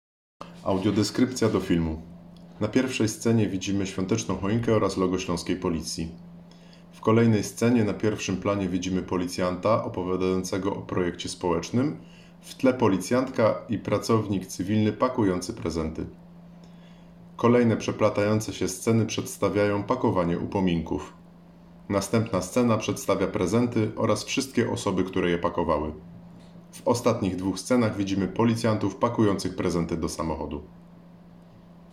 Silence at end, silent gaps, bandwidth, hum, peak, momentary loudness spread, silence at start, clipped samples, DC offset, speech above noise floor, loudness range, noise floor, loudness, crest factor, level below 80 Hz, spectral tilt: 0.35 s; none; 15 kHz; none; -8 dBFS; 7 LU; 0.4 s; under 0.1%; under 0.1%; 25 dB; 2 LU; -50 dBFS; -26 LUFS; 18 dB; -52 dBFS; -6 dB/octave